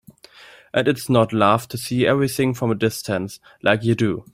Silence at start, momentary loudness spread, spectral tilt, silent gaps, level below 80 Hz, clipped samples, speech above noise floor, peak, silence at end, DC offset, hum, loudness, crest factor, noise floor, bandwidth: 0.4 s; 8 LU; -5.5 dB/octave; none; -56 dBFS; under 0.1%; 27 dB; -2 dBFS; 0.15 s; under 0.1%; none; -20 LUFS; 18 dB; -46 dBFS; 16 kHz